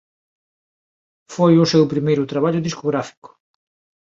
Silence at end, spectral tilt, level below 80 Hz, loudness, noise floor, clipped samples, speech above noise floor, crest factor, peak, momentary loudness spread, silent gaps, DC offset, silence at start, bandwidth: 0.85 s; -6.5 dB/octave; -60 dBFS; -18 LUFS; under -90 dBFS; under 0.1%; over 73 dB; 18 dB; -2 dBFS; 12 LU; 3.17-3.22 s; under 0.1%; 1.3 s; 7.8 kHz